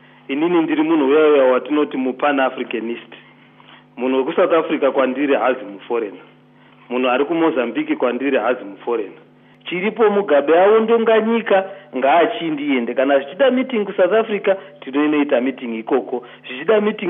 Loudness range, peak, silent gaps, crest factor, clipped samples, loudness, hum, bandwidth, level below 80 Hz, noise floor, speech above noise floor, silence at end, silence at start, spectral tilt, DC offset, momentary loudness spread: 5 LU; -4 dBFS; none; 14 dB; under 0.1%; -17 LUFS; none; 3.8 kHz; -80 dBFS; -48 dBFS; 31 dB; 0 s; 0.3 s; -10 dB/octave; under 0.1%; 11 LU